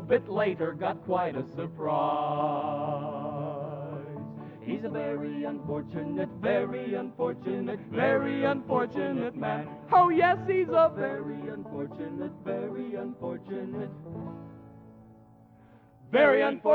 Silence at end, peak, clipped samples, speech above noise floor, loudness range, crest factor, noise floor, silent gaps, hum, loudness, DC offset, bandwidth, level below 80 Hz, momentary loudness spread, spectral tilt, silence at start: 0 s; -10 dBFS; under 0.1%; 27 dB; 11 LU; 18 dB; -56 dBFS; none; none; -29 LUFS; under 0.1%; 6 kHz; -66 dBFS; 15 LU; -9 dB/octave; 0 s